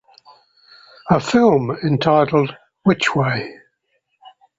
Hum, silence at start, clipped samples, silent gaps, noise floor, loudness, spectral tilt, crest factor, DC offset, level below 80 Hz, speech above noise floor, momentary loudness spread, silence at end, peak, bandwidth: none; 1.05 s; under 0.1%; none; -69 dBFS; -17 LUFS; -6.5 dB/octave; 18 dB; under 0.1%; -54 dBFS; 53 dB; 11 LU; 1.05 s; -2 dBFS; 8 kHz